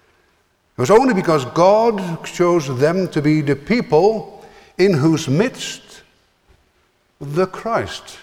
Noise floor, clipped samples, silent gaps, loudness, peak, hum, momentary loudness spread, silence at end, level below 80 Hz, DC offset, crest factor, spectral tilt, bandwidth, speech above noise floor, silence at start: -61 dBFS; under 0.1%; none; -17 LUFS; -2 dBFS; none; 15 LU; 0.05 s; -52 dBFS; under 0.1%; 16 dB; -6 dB/octave; 15.5 kHz; 45 dB; 0.8 s